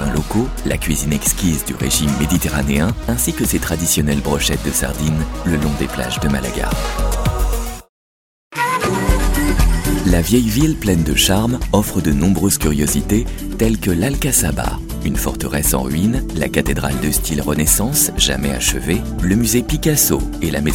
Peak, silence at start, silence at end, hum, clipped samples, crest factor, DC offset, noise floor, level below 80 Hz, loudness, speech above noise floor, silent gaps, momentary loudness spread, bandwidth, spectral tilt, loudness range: 0 dBFS; 0 s; 0 s; none; under 0.1%; 16 dB; under 0.1%; under -90 dBFS; -24 dBFS; -17 LUFS; over 74 dB; 7.89-8.51 s; 7 LU; 17 kHz; -4 dB/octave; 4 LU